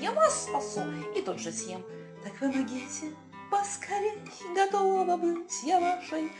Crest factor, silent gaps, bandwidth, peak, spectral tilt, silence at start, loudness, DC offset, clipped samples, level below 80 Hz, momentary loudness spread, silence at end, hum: 20 dB; none; 10.5 kHz; -12 dBFS; -3.5 dB/octave; 0 s; -30 LUFS; under 0.1%; under 0.1%; -72 dBFS; 16 LU; 0 s; none